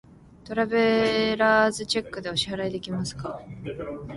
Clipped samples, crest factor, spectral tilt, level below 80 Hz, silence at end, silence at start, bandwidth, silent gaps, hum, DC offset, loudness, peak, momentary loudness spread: under 0.1%; 18 dB; -4.5 dB/octave; -54 dBFS; 0 s; 0.45 s; 11.5 kHz; none; none; under 0.1%; -25 LUFS; -8 dBFS; 15 LU